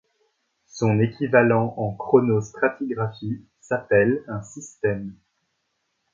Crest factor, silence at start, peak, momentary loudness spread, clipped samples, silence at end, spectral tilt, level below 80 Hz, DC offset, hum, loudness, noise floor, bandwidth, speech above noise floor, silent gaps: 20 dB; 0.75 s; -2 dBFS; 15 LU; under 0.1%; 1 s; -7.5 dB/octave; -56 dBFS; under 0.1%; none; -22 LUFS; -74 dBFS; 7.6 kHz; 52 dB; none